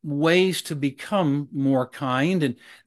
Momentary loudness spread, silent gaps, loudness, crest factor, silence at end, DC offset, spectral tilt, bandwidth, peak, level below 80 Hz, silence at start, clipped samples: 8 LU; none; -23 LUFS; 18 dB; 0.1 s; under 0.1%; -6 dB/octave; 13 kHz; -6 dBFS; -70 dBFS; 0.05 s; under 0.1%